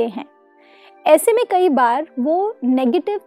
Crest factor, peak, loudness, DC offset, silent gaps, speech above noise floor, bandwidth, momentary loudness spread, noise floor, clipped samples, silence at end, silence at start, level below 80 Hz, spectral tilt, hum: 18 dB; 0 dBFS; -17 LUFS; under 0.1%; none; 33 dB; 15.5 kHz; 9 LU; -50 dBFS; under 0.1%; 0.1 s; 0 s; -80 dBFS; -3.5 dB/octave; none